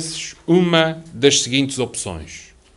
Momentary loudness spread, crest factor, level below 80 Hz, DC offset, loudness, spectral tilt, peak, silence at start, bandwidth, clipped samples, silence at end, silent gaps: 17 LU; 20 dB; -48 dBFS; under 0.1%; -18 LUFS; -3.5 dB/octave; 0 dBFS; 0 s; 11.5 kHz; under 0.1%; 0.35 s; none